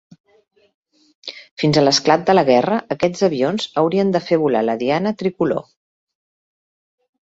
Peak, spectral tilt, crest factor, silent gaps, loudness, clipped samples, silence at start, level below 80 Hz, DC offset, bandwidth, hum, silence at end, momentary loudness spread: -2 dBFS; -5 dB/octave; 18 dB; 1.51-1.57 s; -17 LUFS; under 0.1%; 1.25 s; -58 dBFS; under 0.1%; 8 kHz; none; 1.7 s; 10 LU